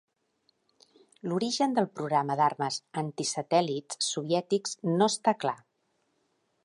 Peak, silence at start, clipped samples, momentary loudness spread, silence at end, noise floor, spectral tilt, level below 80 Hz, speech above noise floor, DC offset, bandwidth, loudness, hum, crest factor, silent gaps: -10 dBFS; 1.25 s; under 0.1%; 8 LU; 1.1 s; -75 dBFS; -4.5 dB/octave; -82 dBFS; 46 dB; under 0.1%; 11.5 kHz; -29 LUFS; none; 20 dB; none